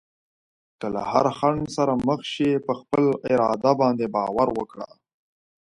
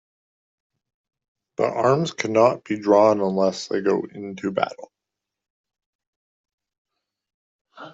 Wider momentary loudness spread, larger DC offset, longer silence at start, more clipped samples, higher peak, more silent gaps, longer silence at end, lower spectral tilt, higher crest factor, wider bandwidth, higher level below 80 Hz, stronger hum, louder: about the same, 10 LU vs 11 LU; neither; second, 0.8 s vs 1.6 s; neither; about the same, -4 dBFS vs -4 dBFS; second, none vs 5.50-5.64 s, 5.86-5.99 s, 6.07-6.44 s, 6.53-6.58 s, 6.78-6.85 s, 7.34-7.65 s; first, 0.75 s vs 0 s; about the same, -6.5 dB/octave vs -6 dB/octave; about the same, 20 dB vs 20 dB; first, 11 kHz vs 8 kHz; first, -56 dBFS vs -70 dBFS; neither; about the same, -23 LUFS vs -21 LUFS